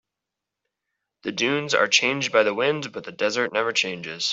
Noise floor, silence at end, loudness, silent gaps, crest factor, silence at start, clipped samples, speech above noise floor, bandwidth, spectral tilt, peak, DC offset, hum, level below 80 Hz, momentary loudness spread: -85 dBFS; 0 s; -22 LUFS; none; 22 dB; 1.25 s; under 0.1%; 62 dB; 8 kHz; -2.5 dB/octave; -4 dBFS; under 0.1%; none; -70 dBFS; 11 LU